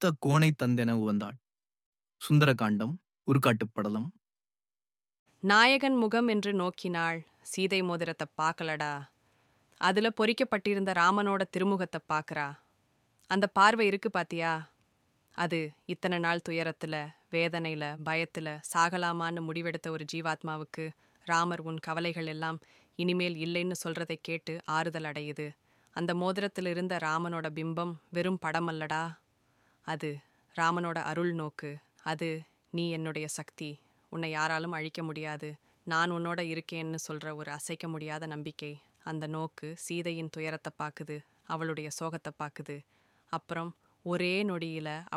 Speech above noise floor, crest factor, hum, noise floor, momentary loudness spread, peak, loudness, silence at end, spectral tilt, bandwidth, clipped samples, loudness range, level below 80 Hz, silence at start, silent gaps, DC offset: over 58 dB; 24 dB; none; under -90 dBFS; 15 LU; -8 dBFS; -32 LUFS; 0 s; -5 dB/octave; 15.5 kHz; under 0.1%; 9 LU; -76 dBFS; 0 s; 1.86-1.92 s, 5.19-5.26 s; under 0.1%